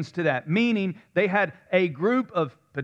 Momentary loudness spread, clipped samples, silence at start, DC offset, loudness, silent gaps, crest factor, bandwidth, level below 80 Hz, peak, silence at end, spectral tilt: 5 LU; under 0.1%; 0 s; under 0.1%; -25 LUFS; none; 18 dB; 8 kHz; -74 dBFS; -8 dBFS; 0 s; -7.5 dB/octave